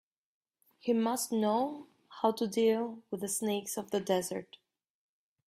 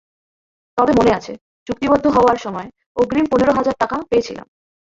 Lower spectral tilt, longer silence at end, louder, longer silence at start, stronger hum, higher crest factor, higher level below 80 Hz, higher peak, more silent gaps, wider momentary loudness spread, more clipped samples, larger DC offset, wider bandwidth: second, -4 dB/octave vs -6 dB/octave; first, 1.05 s vs 0.55 s; second, -33 LUFS vs -17 LUFS; about the same, 0.85 s vs 0.75 s; neither; about the same, 20 dB vs 16 dB; second, -78 dBFS vs -44 dBFS; second, -14 dBFS vs -2 dBFS; second, none vs 1.41-1.66 s, 2.86-2.95 s; second, 10 LU vs 16 LU; neither; neither; first, 16 kHz vs 7.8 kHz